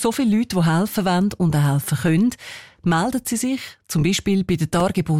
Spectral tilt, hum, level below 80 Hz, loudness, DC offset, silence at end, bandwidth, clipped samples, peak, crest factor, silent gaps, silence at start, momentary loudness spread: -5.5 dB/octave; none; -46 dBFS; -20 LUFS; under 0.1%; 0 s; 16.5 kHz; under 0.1%; -10 dBFS; 10 dB; none; 0 s; 6 LU